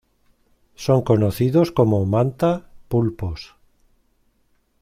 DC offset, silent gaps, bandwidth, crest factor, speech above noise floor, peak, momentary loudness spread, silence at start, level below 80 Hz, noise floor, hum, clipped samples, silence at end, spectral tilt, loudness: under 0.1%; none; 16 kHz; 18 dB; 45 dB; -4 dBFS; 12 LU; 0.8 s; -46 dBFS; -64 dBFS; none; under 0.1%; 1.35 s; -8 dB/octave; -20 LUFS